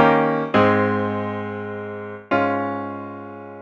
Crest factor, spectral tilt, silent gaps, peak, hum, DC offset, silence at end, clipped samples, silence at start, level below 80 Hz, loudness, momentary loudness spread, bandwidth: 20 dB; -8 dB/octave; none; -2 dBFS; none; under 0.1%; 0 s; under 0.1%; 0 s; -60 dBFS; -21 LUFS; 16 LU; 7.4 kHz